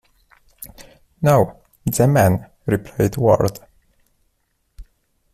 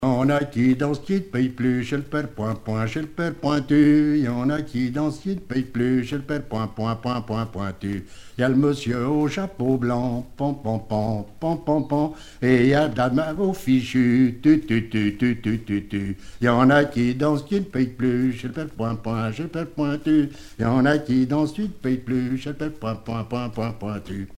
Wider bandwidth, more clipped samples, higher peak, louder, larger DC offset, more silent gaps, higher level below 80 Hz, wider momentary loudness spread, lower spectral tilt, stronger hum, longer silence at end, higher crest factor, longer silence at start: first, 16 kHz vs 13 kHz; neither; about the same, -2 dBFS vs -2 dBFS; first, -18 LUFS vs -23 LUFS; neither; neither; about the same, -46 dBFS vs -46 dBFS; first, 23 LU vs 10 LU; about the same, -7 dB/octave vs -7.5 dB/octave; neither; first, 0.5 s vs 0 s; about the same, 18 dB vs 20 dB; first, 0.6 s vs 0 s